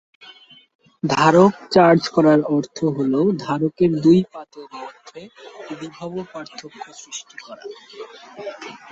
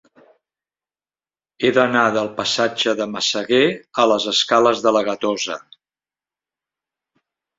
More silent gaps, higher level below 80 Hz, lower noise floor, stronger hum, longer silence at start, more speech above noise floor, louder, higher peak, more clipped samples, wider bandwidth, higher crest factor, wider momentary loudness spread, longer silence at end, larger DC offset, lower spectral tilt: neither; about the same, -60 dBFS vs -64 dBFS; second, -47 dBFS vs under -90 dBFS; second, none vs 50 Hz at -70 dBFS; second, 1.05 s vs 1.6 s; second, 27 dB vs over 72 dB; about the same, -17 LUFS vs -18 LUFS; about the same, -2 dBFS vs 0 dBFS; neither; about the same, 8 kHz vs 7.8 kHz; about the same, 18 dB vs 20 dB; first, 23 LU vs 6 LU; second, 0.15 s vs 2 s; neither; first, -6.5 dB/octave vs -3 dB/octave